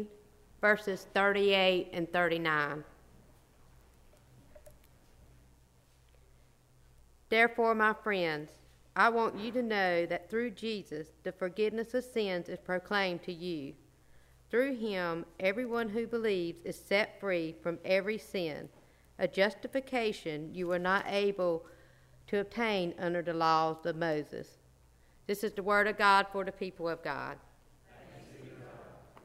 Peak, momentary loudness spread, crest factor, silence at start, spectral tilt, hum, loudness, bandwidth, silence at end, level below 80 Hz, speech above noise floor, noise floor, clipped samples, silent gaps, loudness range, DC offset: -12 dBFS; 15 LU; 22 dB; 0 s; -5 dB/octave; none; -32 LUFS; 16 kHz; 0.25 s; -64 dBFS; 32 dB; -64 dBFS; under 0.1%; none; 5 LU; under 0.1%